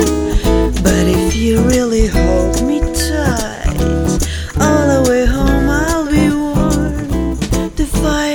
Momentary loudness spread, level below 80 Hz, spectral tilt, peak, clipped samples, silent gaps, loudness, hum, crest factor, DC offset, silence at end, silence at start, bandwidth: 6 LU; -18 dBFS; -5.5 dB/octave; 0 dBFS; under 0.1%; none; -14 LUFS; none; 14 dB; under 0.1%; 0 s; 0 s; over 20 kHz